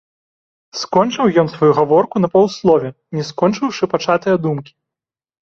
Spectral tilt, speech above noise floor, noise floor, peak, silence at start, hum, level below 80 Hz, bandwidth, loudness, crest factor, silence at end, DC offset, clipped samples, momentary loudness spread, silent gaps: -6.5 dB/octave; 72 dB; -87 dBFS; 0 dBFS; 0.75 s; none; -56 dBFS; 7.4 kHz; -16 LUFS; 16 dB; 0.8 s; under 0.1%; under 0.1%; 11 LU; none